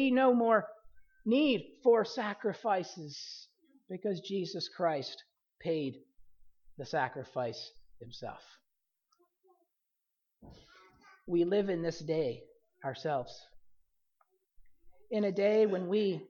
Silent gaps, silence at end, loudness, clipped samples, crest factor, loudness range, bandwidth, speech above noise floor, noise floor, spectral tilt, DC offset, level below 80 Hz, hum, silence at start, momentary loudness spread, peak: none; 0.05 s; -33 LUFS; under 0.1%; 20 dB; 10 LU; 7 kHz; 53 dB; -85 dBFS; -6 dB/octave; under 0.1%; -70 dBFS; none; 0 s; 19 LU; -14 dBFS